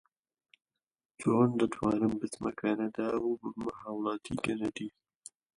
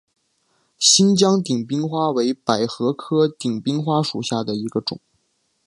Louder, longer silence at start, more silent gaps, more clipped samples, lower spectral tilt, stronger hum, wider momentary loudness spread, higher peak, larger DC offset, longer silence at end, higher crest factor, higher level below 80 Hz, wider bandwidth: second, -33 LUFS vs -19 LUFS; first, 1.2 s vs 0.8 s; neither; neither; first, -6.5 dB/octave vs -4 dB/octave; neither; first, 14 LU vs 11 LU; second, -14 dBFS vs 0 dBFS; neither; about the same, 0.65 s vs 0.7 s; about the same, 20 dB vs 20 dB; about the same, -64 dBFS vs -64 dBFS; about the same, 11.5 kHz vs 11.5 kHz